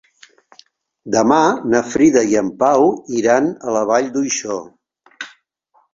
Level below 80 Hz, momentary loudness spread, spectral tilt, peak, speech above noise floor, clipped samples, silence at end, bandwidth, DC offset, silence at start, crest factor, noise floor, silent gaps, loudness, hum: -58 dBFS; 14 LU; -4.5 dB/octave; -2 dBFS; 45 dB; under 0.1%; 0.65 s; 7.8 kHz; under 0.1%; 1.05 s; 16 dB; -60 dBFS; none; -16 LUFS; none